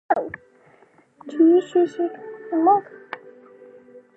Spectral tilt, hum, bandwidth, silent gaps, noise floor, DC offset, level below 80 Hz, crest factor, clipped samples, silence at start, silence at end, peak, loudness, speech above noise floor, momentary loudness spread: -6.5 dB/octave; none; 8 kHz; none; -55 dBFS; under 0.1%; -70 dBFS; 18 dB; under 0.1%; 0.1 s; 1 s; -6 dBFS; -20 LUFS; 36 dB; 21 LU